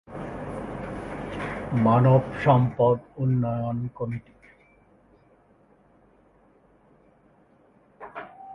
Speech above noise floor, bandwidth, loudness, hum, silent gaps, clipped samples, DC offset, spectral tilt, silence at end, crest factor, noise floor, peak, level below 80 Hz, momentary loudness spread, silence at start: 37 dB; 4.9 kHz; -25 LUFS; none; none; under 0.1%; under 0.1%; -9.5 dB/octave; 0 s; 22 dB; -59 dBFS; -6 dBFS; -52 dBFS; 19 LU; 0.1 s